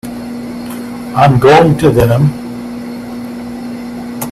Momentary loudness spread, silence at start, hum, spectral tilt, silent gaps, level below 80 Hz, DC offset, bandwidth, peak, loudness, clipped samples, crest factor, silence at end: 17 LU; 0.05 s; 60 Hz at -25 dBFS; -7 dB/octave; none; -36 dBFS; under 0.1%; 14.5 kHz; 0 dBFS; -9 LUFS; under 0.1%; 12 dB; 0 s